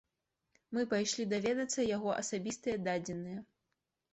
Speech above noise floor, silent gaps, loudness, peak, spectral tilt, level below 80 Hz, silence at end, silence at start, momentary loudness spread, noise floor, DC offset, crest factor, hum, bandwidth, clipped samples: 51 dB; none; -36 LUFS; -22 dBFS; -4 dB/octave; -70 dBFS; 0.7 s; 0.7 s; 8 LU; -86 dBFS; under 0.1%; 16 dB; none; 8.2 kHz; under 0.1%